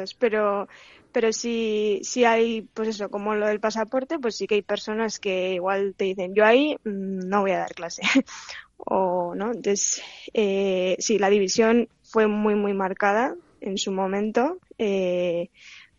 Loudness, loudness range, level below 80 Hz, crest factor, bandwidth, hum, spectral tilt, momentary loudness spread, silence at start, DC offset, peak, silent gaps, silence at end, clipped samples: -24 LUFS; 3 LU; -64 dBFS; 20 dB; 7.8 kHz; none; -4 dB/octave; 9 LU; 0 s; under 0.1%; -4 dBFS; none; 0.2 s; under 0.1%